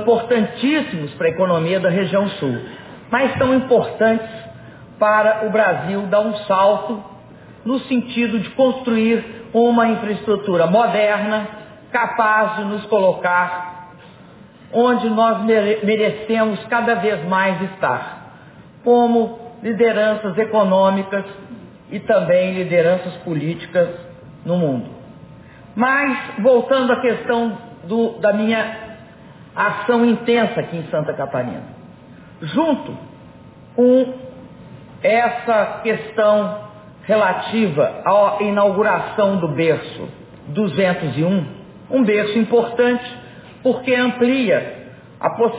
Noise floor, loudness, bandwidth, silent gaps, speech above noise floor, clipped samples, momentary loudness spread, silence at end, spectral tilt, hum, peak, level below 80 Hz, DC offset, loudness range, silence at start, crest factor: -43 dBFS; -18 LUFS; 4 kHz; none; 26 dB; under 0.1%; 16 LU; 0 s; -10 dB/octave; none; -4 dBFS; -56 dBFS; under 0.1%; 3 LU; 0 s; 14 dB